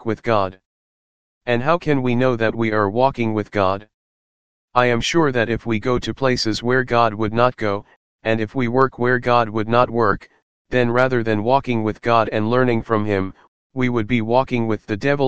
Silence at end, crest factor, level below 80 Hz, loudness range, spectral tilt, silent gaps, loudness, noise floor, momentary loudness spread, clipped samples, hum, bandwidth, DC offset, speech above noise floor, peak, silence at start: 0 s; 18 dB; -46 dBFS; 2 LU; -6.5 dB/octave; 0.66-1.41 s, 3.94-4.68 s, 7.96-8.19 s, 10.42-10.65 s, 13.48-13.70 s; -19 LUFS; under -90 dBFS; 6 LU; under 0.1%; none; 9 kHz; 2%; over 71 dB; 0 dBFS; 0 s